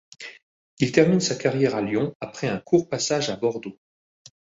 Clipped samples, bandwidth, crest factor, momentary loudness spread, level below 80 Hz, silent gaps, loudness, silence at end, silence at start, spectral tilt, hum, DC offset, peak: under 0.1%; 8 kHz; 20 dB; 19 LU; -60 dBFS; 0.43-0.77 s, 2.15-2.20 s; -23 LUFS; 0.85 s; 0.2 s; -5 dB/octave; none; under 0.1%; -4 dBFS